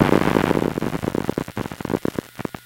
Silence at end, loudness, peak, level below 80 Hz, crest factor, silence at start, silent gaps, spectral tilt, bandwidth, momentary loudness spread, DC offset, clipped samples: 0.05 s; -23 LUFS; 0 dBFS; -42 dBFS; 22 dB; 0 s; none; -6.5 dB/octave; 17 kHz; 12 LU; under 0.1%; under 0.1%